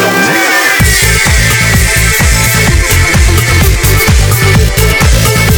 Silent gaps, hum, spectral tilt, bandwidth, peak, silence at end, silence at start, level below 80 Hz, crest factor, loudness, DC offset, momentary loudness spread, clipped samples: none; none; -3.5 dB/octave; over 20 kHz; 0 dBFS; 0 s; 0 s; -12 dBFS; 6 dB; -7 LUFS; under 0.1%; 1 LU; 0.7%